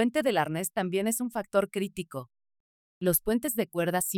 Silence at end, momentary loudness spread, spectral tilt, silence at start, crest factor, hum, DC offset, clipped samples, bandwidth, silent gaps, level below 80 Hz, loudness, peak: 0 s; 8 LU; -4.5 dB/octave; 0 s; 18 dB; none; under 0.1%; under 0.1%; 19.5 kHz; 2.60-3.01 s; -58 dBFS; -29 LUFS; -12 dBFS